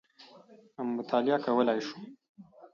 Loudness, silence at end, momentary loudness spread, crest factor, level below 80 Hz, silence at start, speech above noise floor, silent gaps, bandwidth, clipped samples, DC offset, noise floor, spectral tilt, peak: -30 LUFS; 0.05 s; 21 LU; 18 dB; -84 dBFS; 0.2 s; 26 dB; 2.29-2.35 s; 7.2 kHz; under 0.1%; under 0.1%; -56 dBFS; -6 dB/octave; -14 dBFS